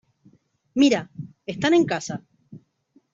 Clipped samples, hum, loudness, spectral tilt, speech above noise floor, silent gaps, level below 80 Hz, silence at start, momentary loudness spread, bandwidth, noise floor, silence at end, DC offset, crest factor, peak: under 0.1%; none; -22 LUFS; -5 dB/octave; 42 dB; none; -64 dBFS; 0.75 s; 17 LU; 7.8 kHz; -62 dBFS; 0.55 s; under 0.1%; 18 dB; -6 dBFS